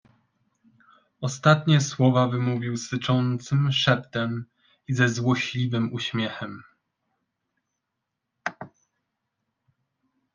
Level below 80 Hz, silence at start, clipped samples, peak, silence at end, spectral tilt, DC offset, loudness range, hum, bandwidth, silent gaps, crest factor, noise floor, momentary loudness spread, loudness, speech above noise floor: -64 dBFS; 1.2 s; under 0.1%; -6 dBFS; 1.65 s; -5.5 dB/octave; under 0.1%; 21 LU; none; 9.6 kHz; none; 22 dB; -82 dBFS; 15 LU; -24 LUFS; 59 dB